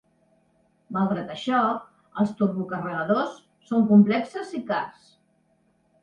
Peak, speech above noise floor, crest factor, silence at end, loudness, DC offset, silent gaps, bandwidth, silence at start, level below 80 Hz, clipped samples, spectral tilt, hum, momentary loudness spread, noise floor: -6 dBFS; 43 dB; 20 dB; 1.1 s; -24 LUFS; under 0.1%; none; 8.6 kHz; 0.9 s; -68 dBFS; under 0.1%; -8 dB/octave; none; 15 LU; -66 dBFS